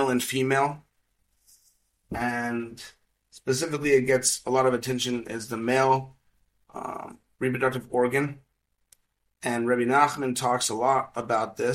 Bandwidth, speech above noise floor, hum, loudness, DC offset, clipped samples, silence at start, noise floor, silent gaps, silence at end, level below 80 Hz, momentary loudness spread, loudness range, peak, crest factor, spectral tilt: 16.5 kHz; 46 dB; none; -26 LUFS; under 0.1%; under 0.1%; 0 s; -71 dBFS; none; 0 s; -60 dBFS; 16 LU; 6 LU; -6 dBFS; 20 dB; -4 dB/octave